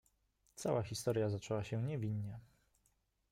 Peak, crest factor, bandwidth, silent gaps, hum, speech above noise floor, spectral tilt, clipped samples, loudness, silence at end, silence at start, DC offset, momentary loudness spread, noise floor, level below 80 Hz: -24 dBFS; 18 dB; 16 kHz; none; none; 40 dB; -6 dB/octave; under 0.1%; -40 LUFS; 0.9 s; 0.55 s; under 0.1%; 11 LU; -79 dBFS; -70 dBFS